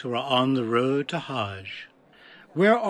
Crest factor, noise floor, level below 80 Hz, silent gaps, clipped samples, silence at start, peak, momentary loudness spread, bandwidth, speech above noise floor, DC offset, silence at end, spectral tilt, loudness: 18 dB; -52 dBFS; -78 dBFS; none; under 0.1%; 0 s; -8 dBFS; 14 LU; 12 kHz; 28 dB; under 0.1%; 0 s; -6.5 dB/octave; -25 LUFS